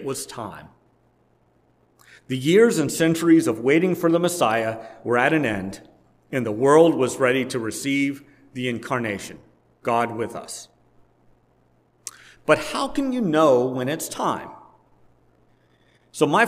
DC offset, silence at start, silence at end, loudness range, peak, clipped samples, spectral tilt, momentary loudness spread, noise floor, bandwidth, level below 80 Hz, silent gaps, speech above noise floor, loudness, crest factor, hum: under 0.1%; 0 s; 0 s; 9 LU; -2 dBFS; under 0.1%; -5 dB/octave; 19 LU; -62 dBFS; 16 kHz; -60 dBFS; none; 41 dB; -21 LUFS; 20 dB; none